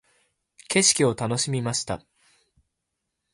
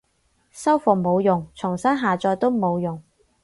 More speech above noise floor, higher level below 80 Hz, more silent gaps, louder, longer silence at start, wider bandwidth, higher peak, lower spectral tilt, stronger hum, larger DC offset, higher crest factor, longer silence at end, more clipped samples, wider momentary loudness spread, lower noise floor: first, 58 dB vs 45 dB; about the same, -58 dBFS vs -58 dBFS; neither; about the same, -22 LUFS vs -21 LUFS; first, 0.7 s vs 0.55 s; about the same, 11.5 kHz vs 11.5 kHz; about the same, -6 dBFS vs -4 dBFS; second, -3 dB/octave vs -7 dB/octave; neither; neither; about the same, 22 dB vs 18 dB; first, 1.35 s vs 0.4 s; neither; first, 12 LU vs 8 LU; first, -81 dBFS vs -66 dBFS